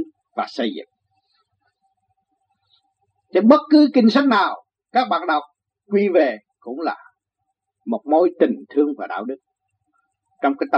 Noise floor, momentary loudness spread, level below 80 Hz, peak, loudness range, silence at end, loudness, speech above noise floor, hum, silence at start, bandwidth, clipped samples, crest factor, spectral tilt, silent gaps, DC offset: -78 dBFS; 18 LU; -78 dBFS; 0 dBFS; 6 LU; 0 s; -19 LUFS; 60 dB; none; 0 s; 6.8 kHz; under 0.1%; 20 dB; -7 dB/octave; none; under 0.1%